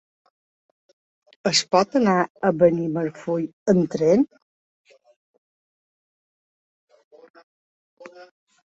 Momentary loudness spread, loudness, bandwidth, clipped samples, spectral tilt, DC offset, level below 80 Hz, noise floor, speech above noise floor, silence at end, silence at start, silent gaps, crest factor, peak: 8 LU; -21 LUFS; 8.2 kHz; under 0.1%; -5 dB/octave; under 0.1%; -64 dBFS; under -90 dBFS; over 70 dB; 0.5 s; 1.45 s; 2.30-2.35 s, 3.53-3.66 s, 4.42-4.85 s, 5.16-6.88 s, 7.04-7.11 s, 7.30-7.34 s, 7.43-7.97 s; 22 dB; -2 dBFS